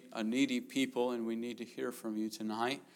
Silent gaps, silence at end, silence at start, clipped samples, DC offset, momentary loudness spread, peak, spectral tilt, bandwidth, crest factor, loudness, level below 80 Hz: none; 0.1 s; 0 s; under 0.1%; under 0.1%; 8 LU; -18 dBFS; -4 dB/octave; 17.5 kHz; 18 dB; -37 LUFS; under -90 dBFS